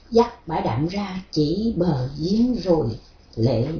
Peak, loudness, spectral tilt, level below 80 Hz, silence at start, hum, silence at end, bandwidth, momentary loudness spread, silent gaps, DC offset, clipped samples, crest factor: -4 dBFS; -23 LUFS; -8 dB/octave; -42 dBFS; 0.1 s; none; 0 s; 5.4 kHz; 8 LU; none; under 0.1%; under 0.1%; 18 dB